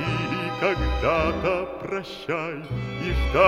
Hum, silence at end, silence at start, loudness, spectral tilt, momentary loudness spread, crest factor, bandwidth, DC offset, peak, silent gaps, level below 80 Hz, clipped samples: none; 0 s; 0 s; -26 LUFS; -6.5 dB/octave; 8 LU; 18 dB; 12 kHz; under 0.1%; -6 dBFS; none; -32 dBFS; under 0.1%